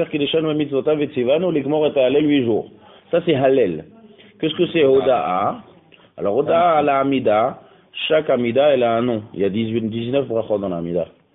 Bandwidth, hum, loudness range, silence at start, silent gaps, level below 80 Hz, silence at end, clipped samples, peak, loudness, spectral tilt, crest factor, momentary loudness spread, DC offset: 4 kHz; none; 2 LU; 0 s; none; -56 dBFS; 0.3 s; under 0.1%; -4 dBFS; -19 LUFS; -11 dB/octave; 14 dB; 9 LU; under 0.1%